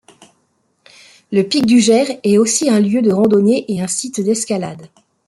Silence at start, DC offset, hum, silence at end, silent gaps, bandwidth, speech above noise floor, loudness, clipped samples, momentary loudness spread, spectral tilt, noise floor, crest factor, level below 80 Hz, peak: 1.3 s; under 0.1%; none; 0.4 s; none; 12.5 kHz; 49 dB; -14 LUFS; under 0.1%; 8 LU; -4.5 dB/octave; -63 dBFS; 14 dB; -60 dBFS; -2 dBFS